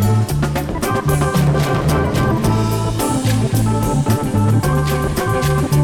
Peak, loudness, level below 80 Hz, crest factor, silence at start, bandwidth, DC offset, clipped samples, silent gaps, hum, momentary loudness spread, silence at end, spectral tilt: -2 dBFS; -17 LUFS; -28 dBFS; 12 dB; 0 s; 19.5 kHz; under 0.1%; under 0.1%; none; none; 3 LU; 0 s; -6 dB/octave